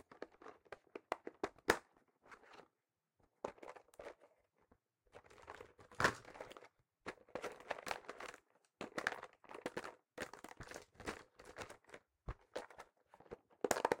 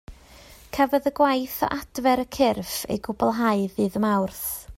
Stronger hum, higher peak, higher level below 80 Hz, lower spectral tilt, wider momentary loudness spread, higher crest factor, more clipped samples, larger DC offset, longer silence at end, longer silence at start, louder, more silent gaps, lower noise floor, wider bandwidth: neither; second, -18 dBFS vs -8 dBFS; second, -68 dBFS vs -50 dBFS; second, -3 dB/octave vs -5 dB/octave; first, 22 LU vs 7 LU; first, 30 dB vs 16 dB; neither; neither; about the same, 0 s vs 0 s; about the same, 0.1 s vs 0.1 s; second, -46 LUFS vs -24 LUFS; neither; first, -90 dBFS vs -48 dBFS; about the same, 16.5 kHz vs 16 kHz